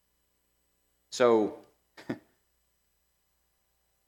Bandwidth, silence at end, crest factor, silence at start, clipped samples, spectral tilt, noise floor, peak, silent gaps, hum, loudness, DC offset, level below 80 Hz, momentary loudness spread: 17.5 kHz; 1.9 s; 24 dB; 1.1 s; under 0.1%; -4.5 dB/octave; -75 dBFS; -10 dBFS; none; 60 Hz at -70 dBFS; -26 LUFS; under 0.1%; -80 dBFS; 17 LU